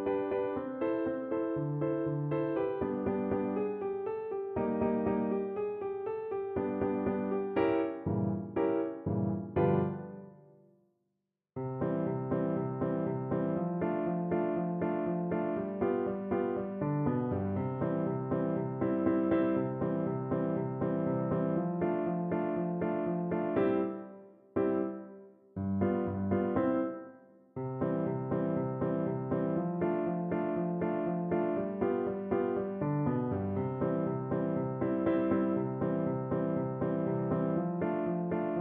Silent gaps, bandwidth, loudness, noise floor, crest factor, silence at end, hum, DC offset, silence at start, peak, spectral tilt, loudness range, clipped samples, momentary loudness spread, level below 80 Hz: none; 4 kHz; -33 LUFS; -85 dBFS; 16 dB; 0 s; none; under 0.1%; 0 s; -16 dBFS; -12 dB/octave; 2 LU; under 0.1%; 5 LU; -58 dBFS